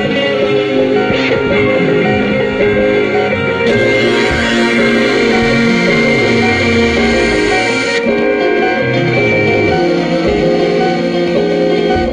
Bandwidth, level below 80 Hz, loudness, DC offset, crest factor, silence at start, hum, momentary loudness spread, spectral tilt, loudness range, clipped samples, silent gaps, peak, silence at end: 10 kHz; -34 dBFS; -11 LUFS; under 0.1%; 10 dB; 0 s; none; 3 LU; -5.5 dB/octave; 2 LU; under 0.1%; none; 0 dBFS; 0 s